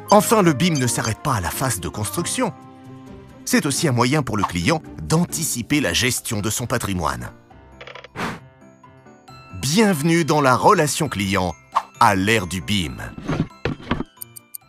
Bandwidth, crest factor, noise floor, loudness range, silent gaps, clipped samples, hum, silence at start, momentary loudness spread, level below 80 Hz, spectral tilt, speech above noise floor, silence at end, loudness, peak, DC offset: 16 kHz; 20 dB; -47 dBFS; 6 LU; none; under 0.1%; none; 0 s; 16 LU; -44 dBFS; -4.5 dB/octave; 28 dB; 0.65 s; -20 LUFS; 0 dBFS; under 0.1%